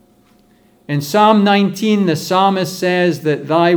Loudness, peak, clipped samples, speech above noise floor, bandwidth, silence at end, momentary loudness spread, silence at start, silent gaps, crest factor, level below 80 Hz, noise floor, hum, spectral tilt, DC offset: -14 LUFS; 0 dBFS; under 0.1%; 38 dB; over 20 kHz; 0 s; 7 LU; 0.9 s; none; 14 dB; -64 dBFS; -51 dBFS; none; -5.5 dB/octave; under 0.1%